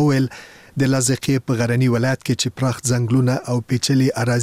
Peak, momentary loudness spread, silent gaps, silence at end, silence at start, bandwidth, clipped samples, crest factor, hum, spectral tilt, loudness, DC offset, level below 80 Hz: -4 dBFS; 5 LU; none; 0 s; 0 s; 15.5 kHz; under 0.1%; 14 dB; none; -5.5 dB/octave; -19 LUFS; 0.2%; -52 dBFS